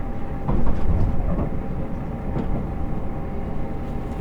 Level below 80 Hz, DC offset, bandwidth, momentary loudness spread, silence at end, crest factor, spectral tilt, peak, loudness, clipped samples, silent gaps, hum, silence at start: -26 dBFS; under 0.1%; 3.4 kHz; 6 LU; 0 s; 16 dB; -10 dB/octave; -6 dBFS; -28 LUFS; under 0.1%; none; none; 0 s